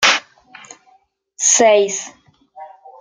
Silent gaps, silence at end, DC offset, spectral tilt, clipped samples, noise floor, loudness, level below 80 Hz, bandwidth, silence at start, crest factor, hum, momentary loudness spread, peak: none; 0.35 s; under 0.1%; 0 dB/octave; under 0.1%; -56 dBFS; -14 LUFS; -66 dBFS; 13.5 kHz; 0 s; 18 dB; none; 14 LU; 0 dBFS